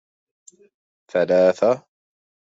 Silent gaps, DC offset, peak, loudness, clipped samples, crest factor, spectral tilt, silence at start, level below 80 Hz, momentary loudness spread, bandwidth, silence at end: none; under 0.1%; -6 dBFS; -19 LUFS; under 0.1%; 18 dB; -6 dB/octave; 1.15 s; -70 dBFS; 10 LU; 7.8 kHz; 0.75 s